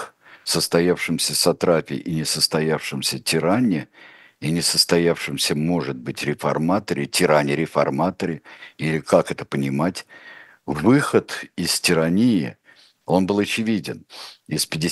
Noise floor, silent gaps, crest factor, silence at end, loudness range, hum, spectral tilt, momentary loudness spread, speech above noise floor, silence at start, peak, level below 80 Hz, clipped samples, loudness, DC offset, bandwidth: -54 dBFS; none; 20 dB; 0 s; 2 LU; none; -4 dB/octave; 13 LU; 33 dB; 0 s; 0 dBFS; -56 dBFS; under 0.1%; -21 LUFS; under 0.1%; 13 kHz